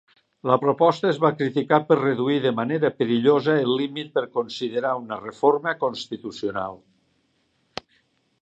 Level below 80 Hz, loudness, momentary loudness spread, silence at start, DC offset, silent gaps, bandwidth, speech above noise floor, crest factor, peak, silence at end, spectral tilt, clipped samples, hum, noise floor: -68 dBFS; -23 LUFS; 13 LU; 0.45 s; under 0.1%; none; 8 kHz; 46 dB; 20 dB; -2 dBFS; 1.65 s; -6.5 dB/octave; under 0.1%; none; -68 dBFS